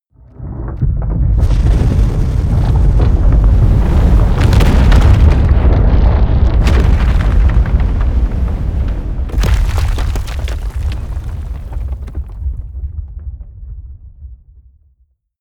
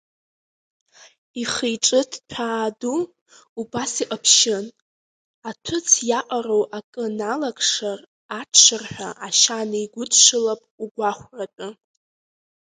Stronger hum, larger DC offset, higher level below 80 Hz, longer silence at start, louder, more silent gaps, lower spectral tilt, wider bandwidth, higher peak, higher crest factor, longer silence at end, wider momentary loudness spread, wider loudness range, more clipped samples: neither; neither; first, -14 dBFS vs -64 dBFS; second, 0.4 s vs 1.35 s; first, -14 LUFS vs -19 LUFS; second, none vs 3.21-3.26 s, 3.49-3.56 s, 4.82-5.42 s, 6.84-6.93 s, 8.07-8.29 s, 10.71-10.78 s, 10.91-10.95 s; first, -7.5 dB/octave vs -0.5 dB/octave; second, 9.4 kHz vs 11 kHz; about the same, 0 dBFS vs 0 dBFS; second, 12 dB vs 22 dB; about the same, 1.05 s vs 0.95 s; second, 15 LU vs 21 LU; first, 15 LU vs 7 LU; neither